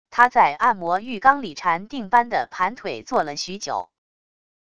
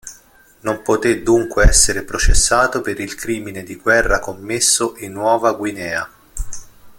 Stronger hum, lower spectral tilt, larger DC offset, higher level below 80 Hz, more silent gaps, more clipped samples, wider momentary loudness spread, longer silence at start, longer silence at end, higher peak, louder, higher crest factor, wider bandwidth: neither; about the same, -3.5 dB/octave vs -3 dB/octave; first, 0.5% vs under 0.1%; second, -60 dBFS vs -24 dBFS; neither; neither; second, 11 LU vs 17 LU; about the same, 0.1 s vs 0.05 s; first, 0.8 s vs 0.05 s; about the same, 0 dBFS vs 0 dBFS; second, -21 LUFS vs -17 LUFS; about the same, 22 dB vs 18 dB; second, 11 kHz vs 17 kHz